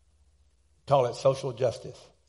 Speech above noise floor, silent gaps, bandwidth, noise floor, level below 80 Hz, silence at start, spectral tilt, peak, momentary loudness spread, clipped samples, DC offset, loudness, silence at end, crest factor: 39 dB; none; 11.5 kHz; -66 dBFS; -64 dBFS; 0.85 s; -6 dB/octave; -10 dBFS; 15 LU; under 0.1%; under 0.1%; -27 LUFS; 0.3 s; 20 dB